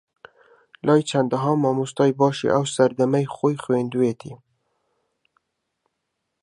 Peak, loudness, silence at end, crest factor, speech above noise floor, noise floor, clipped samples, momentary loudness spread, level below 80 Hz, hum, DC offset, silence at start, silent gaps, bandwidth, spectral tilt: -4 dBFS; -21 LUFS; 2.05 s; 20 dB; 58 dB; -78 dBFS; under 0.1%; 5 LU; -66 dBFS; none; under 0.1%; 0.85 s; none; 11 kHz; -6.5 dB/octave